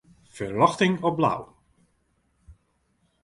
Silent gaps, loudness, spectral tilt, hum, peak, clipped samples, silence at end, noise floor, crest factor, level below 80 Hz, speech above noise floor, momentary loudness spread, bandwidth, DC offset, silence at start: none; -24 LUFS; -6 dB/octave; none; -2 dBFS; under 0.1%; 0.7 s; -69 dBFS; 24 dB; -60 dBFS; 46 dB; 13 LU; 11.5 kHz; under 0.1%; 0.35 s